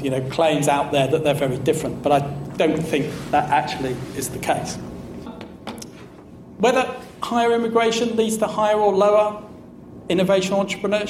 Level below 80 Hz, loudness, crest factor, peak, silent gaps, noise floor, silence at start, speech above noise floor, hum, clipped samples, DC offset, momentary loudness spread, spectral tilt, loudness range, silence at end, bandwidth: -50 dBFS; -20 LUFS; 14 dB; -6 dBFS; none; -41 dBFS; 0 s; 22 dB; none; under 0.1%; under 0.1%; 17 LU; -5 dB/octave; 6 LU; 0 s; 16 kHz